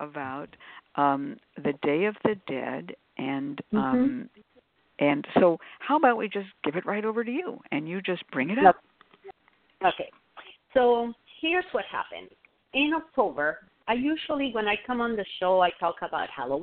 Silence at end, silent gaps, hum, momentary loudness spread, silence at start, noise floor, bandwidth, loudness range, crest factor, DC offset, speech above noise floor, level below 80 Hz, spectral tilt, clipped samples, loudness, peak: 0 s; none; none; 13 LU; 0 s; -65 dBFS; 4.4 kHz; 3 LU; 24 dB; under 0.1%; 38 dB; -64 dBFS; -3 dB/octave; under 0.1%; -27 LUFS; -4 dBFS